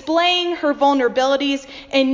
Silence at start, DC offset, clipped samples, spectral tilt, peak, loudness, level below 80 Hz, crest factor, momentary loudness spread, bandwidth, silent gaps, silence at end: 0 s; under 0.1%; under 0.1%; -3 dB/octave; -4 dBFS; -18 LUFS; -56 dBFS; 14 dB; 6 LU; 7.6 kHz; none; 0 s